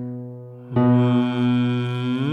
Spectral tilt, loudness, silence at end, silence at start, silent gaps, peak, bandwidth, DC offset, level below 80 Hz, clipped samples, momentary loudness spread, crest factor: -9 dB/octave; -20 LUFS; 0 s; 0 s; none; -8 dBFS; 4.8 kHz; under 0.1%; -62 dBFS; under 0.1%; 17 LU; 14 dB